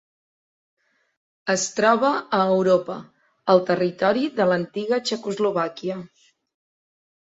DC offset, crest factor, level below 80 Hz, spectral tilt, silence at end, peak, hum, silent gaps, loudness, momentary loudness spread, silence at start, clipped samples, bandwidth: under 0.1%; 20 dB; -68 dBFS; -4.5 dB/octave; 1.3 s; -4 dBFS; none; none; -22 LUFS; 12 LU; 1.45 s; under 0.1%; 8 kHz